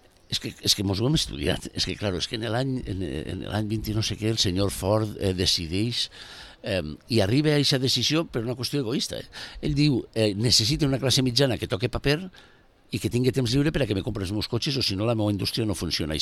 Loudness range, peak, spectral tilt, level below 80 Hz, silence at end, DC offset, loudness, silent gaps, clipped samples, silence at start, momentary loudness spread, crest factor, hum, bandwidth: 3 LU; -6 dBFS; -4.5 dB/octave; -44 dBFS; 0 s; under 0.1%; -25 LUFS; none; under 0.1%; 0.3 s; 9 LU; 20 dB; none; 15.5 kHz